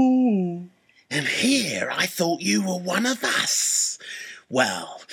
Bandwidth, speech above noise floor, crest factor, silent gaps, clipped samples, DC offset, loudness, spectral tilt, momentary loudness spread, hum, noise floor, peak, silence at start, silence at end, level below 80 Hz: 17 kHz; 22 dB; 18 dB; none; under 0.1%; under 0.1%; -22 LUFS; -3 dB/octave; 12 LU; none; -46 dBFS; -6 dBFS; 0 s; 0 s; -72 dBFS